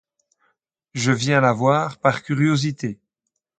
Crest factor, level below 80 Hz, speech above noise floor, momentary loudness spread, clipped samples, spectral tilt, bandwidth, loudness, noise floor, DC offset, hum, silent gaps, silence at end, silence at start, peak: 20 dB; -62 dBFS; 60 dB; 13 LU; under 0.1%; -5.5 dB/octave; 9.2 kHz; -20 LUFS; -79 dBFS; under 0.1%; none; none; 0.65 s; 0.95 s; 0 dBFS